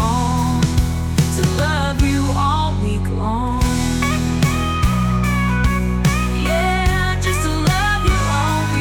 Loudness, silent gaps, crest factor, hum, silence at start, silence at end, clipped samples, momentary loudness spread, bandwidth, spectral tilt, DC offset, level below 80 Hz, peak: -18 LUFS; none; 12 dB; none; 0 s; 0 s; under 0.1%; 2 LU; 19.5 kHz; -5.5 dB/octave; under 0.1%; -24 dBFS; -4 dBFS